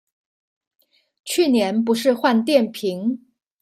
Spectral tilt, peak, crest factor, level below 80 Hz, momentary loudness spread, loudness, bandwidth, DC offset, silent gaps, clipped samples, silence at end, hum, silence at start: -4.5 dB/octave; -2 dBFS; 18 dB; -70 dBFS; 9 LU; -19 LUFS; 16 kHz; under 0.1%; none; under 0.1%; 0.45 s; none; 1.25 s